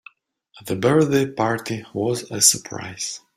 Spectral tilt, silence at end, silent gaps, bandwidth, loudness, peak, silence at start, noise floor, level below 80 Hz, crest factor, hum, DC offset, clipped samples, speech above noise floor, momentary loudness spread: -3.5 dB/octave; 0.2 s; none; 16 kHz; -20 LUFS; -2 dBFS; 0.55 s; -56 dBFS; -60 dBFS; 22 dB; none; under 0.1%; under 0.1%; 34 dB; 14 LU